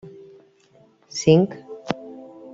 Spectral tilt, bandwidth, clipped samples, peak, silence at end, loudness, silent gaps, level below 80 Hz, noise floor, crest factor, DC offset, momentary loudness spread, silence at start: -6 dB/octave; 7.8 kHz; under 0.1%; -2 dBFS; 0.3 s; -21 LUFS; none; -62 dBFS; -56 dBFS; 22 dB; under 0.1%; 24 LU; 1.15 s